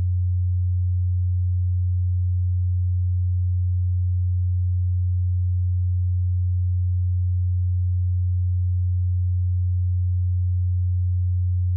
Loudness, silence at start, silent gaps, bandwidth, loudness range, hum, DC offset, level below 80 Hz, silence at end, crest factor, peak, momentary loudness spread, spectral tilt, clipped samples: -23 LUFS; 0 s; none; 0.2 kHz; 0 LU; none; under 0.1%; -34 dBFS; 0 s; 4 dB; -18 dBFS; 0 LU; -33 dB/octave; under 0.1%